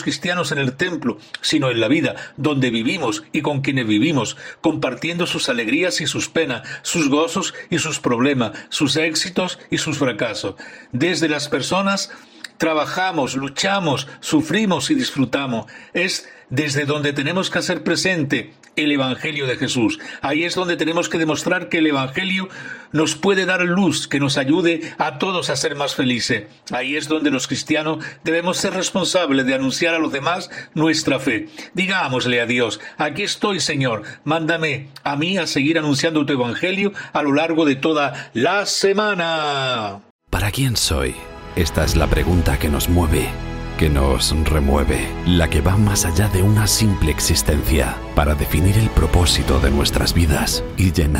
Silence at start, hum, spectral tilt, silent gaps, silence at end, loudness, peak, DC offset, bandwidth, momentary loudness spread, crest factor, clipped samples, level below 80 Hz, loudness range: 0 s; none; -4.5 dB/octave; 40.10-40.19 s; 0 s; -19 LUFS; 0 dBFS; under 0.1%; 16.5 kHz; 7 LU; 18 dB; under 0.1%; -30 dBFS; 3 LU